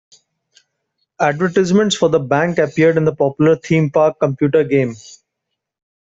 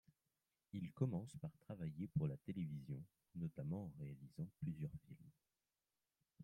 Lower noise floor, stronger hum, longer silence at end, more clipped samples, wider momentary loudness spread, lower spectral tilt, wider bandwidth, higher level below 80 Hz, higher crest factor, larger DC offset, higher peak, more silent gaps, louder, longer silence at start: second, -78 dBFS vs under -90 dBFS; neither; first, 0.95 s vs 0 s; neither; second, 4 LU vs 11 LU; second, -6 dB/octave vs -9 dB/octave; second, 8 kHz vs 10 kHz; first, -56 dBFS vs -74 dBFS; second, 14 dB vs 22 dB; neither; first, -2 dBFS vs -26 dBFS; neither; first, -15 LUFS vs -49 LUFS; first, 1.2 s vs 0.75 s